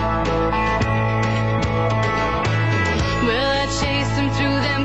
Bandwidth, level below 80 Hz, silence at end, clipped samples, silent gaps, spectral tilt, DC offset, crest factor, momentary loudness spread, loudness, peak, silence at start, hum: 8.4 kHz; -32 dBFS; 0 s; under 0.1%; none; -5.5 dB/octave; 0.8%; 12 dB; 1 LU; -20 LUFS; -8 dBFS; 0 s; none